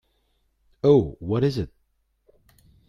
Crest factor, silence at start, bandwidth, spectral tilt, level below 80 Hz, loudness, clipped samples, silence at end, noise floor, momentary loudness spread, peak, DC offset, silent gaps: 20 dB; 0.85 s; 7.2 kHz; -9 dB/octave; -50 dBFS; -22 LUFS; under 0.1%; 1.2 s; -70 dBFS; 13 LU; -6 dBFS; under 0.1%; none